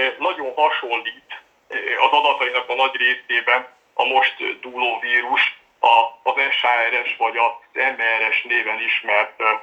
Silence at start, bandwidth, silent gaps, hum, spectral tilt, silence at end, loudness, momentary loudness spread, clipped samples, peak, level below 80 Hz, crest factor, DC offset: 0 s; 8.2 kHz; none; none; -1.5 dB/octave; 0 s; -18 LUFS; 9 LU; under 0.1%; -2 dBFS; -76 dBFS; 18 dB; under 0.1%